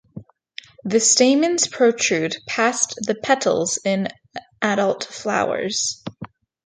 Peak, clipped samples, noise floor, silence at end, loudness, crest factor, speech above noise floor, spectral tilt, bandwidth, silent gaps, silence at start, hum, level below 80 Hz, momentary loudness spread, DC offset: -2 dBFS; under 0.1%; -43 dBFS; 0.4 s; -19 LUFS; 18 dB; 23 dB; -2.5 dB/octave; 9.6 kHz; none; 0.15 s; none; -64 dBFS; 22 LU; under 0.1%